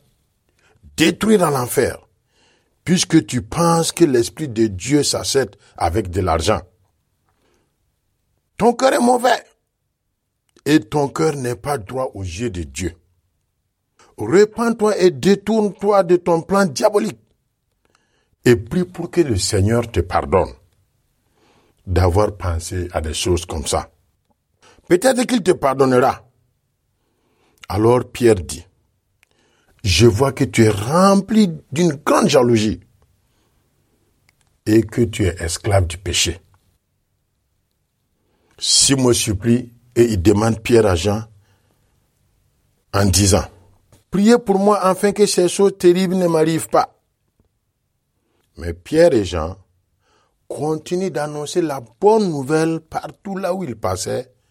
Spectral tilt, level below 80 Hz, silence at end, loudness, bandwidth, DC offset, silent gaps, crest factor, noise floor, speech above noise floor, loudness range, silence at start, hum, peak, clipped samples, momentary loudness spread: -5 dB/octave; -40 dBFS; 0.3 s; -17 LUFS; 16.5 kHz; under 0.1%; none; 18 dB; -73 dBFS; 56 dB; 6 LU; 1 s; none; 0 dBFS; under 0.1%; 11 LU